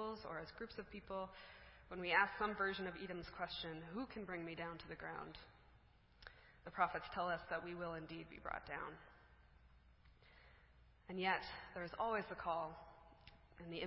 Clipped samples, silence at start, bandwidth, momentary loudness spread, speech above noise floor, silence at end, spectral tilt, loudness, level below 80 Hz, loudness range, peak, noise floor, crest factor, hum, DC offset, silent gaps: under 0.1%; 0 s; 5.6 kHz; 21 LU; 24 dB; 0 s; -2.5 dB/octave; -45 LUFS; -68 dBFS; 8 LU; -20 dBFS; -69 dBFS; 26 dB; none; under 0.1%; none